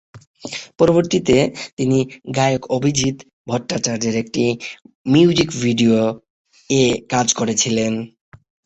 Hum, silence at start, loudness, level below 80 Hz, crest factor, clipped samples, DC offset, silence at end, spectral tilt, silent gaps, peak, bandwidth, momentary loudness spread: none; 0.15 s; -18 LUFS; -50 dBFS; 16 dB; under 0.1%; under 0.1%; 0.6 s; -4.5 dB/octave; 0.27-0.34 s, 1.73-1.77 s, 3.33-3.45 s, 4.95-5.05 s, 6.30-6.45 s; -2 dBFS; 8.4 kHz; 15 LU